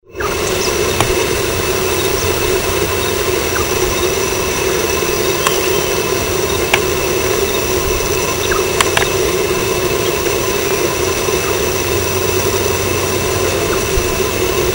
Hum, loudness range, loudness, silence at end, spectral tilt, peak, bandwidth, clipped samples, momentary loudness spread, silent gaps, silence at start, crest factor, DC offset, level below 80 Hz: none; 1 LU; -15 LUFS; 0 s; -3 dB/octave; 0 dBFS; 16.5 kHz; under 0.1%; 2 LU; none; 0.1 s; 16 dB; under 0.1%; -30 dBFS